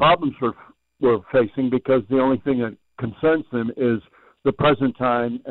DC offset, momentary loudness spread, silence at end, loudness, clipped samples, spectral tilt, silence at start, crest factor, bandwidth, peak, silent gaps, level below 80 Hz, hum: under 0.1%; 8 LU; 0 s; -21 LUFS; under 0.1%; -10 dB/octave; 0 s; 12 dB; 4.3 kHz; -8 dBFS; none; -52 dBFS; none